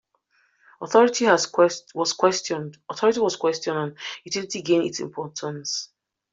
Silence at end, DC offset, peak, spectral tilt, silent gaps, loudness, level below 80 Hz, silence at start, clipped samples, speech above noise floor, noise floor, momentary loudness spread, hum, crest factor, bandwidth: 0.45 s; under 0.1%; -4 dBFS; -3.5 dB/octave; none; -23 LUFS; -70 dBFS; 0.8 s; under 0.1%; 43 dB; -66 dBFS; 13 LU; none; 20 dB; 7.8 kHz